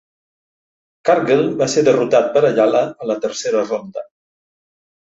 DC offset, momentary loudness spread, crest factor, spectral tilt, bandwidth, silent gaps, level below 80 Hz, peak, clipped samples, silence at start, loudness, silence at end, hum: under 0.1%; 9 LU; 16 dB; -5 dB/octave; 8 kHz; none; -62 dBFS; -2 dBFS; under 0.1%; 1.05 s; -16 LUFS; 1.1 s; none